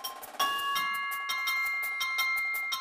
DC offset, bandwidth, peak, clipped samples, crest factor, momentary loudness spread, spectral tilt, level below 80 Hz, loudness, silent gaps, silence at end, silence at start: under 0.1%; 15.5 kHz; -16 dBFS; under 0.1%; 16 dB; 4 LU; 1.5 dB/octave; -74 dBFS; -29 LUFS; none; 0 s; 0 s